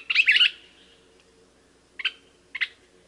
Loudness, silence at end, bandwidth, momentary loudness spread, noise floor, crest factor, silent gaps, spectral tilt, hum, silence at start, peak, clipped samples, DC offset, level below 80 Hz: -22 LUFS; 0.4 s; 11.5 kHz; 14 LU; -59 dBFS; 18 dB; none; 1.5 dB/octave; none; 0.1 s; -8 dBFS; under 0.1%; under 0.1%; -70 dBFS